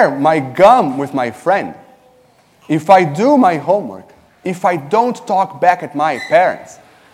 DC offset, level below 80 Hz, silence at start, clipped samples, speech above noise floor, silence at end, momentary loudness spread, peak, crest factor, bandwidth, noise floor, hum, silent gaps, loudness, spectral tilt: under 0.1%; -58 dBFS; 0 s; 0.1%; 37 dB; 0.4 s; 10 LU; 0 dBFS; 14 dB; 14.5 kHz; -50 dBFS; none; none; -14 LUFS; -6 dB/octave